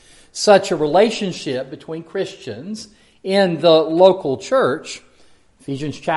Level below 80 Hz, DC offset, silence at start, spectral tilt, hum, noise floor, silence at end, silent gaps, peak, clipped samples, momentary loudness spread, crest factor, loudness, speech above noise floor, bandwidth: -58 dBFS; under 0.1%; 0.35 s; -5 dB/octave; none; -50 dBFS; 0 s; none; 0 dBFS; under 0.1%; 19 LU; 18 dB; -17 LUFS; 33 dB; 11.5 kHz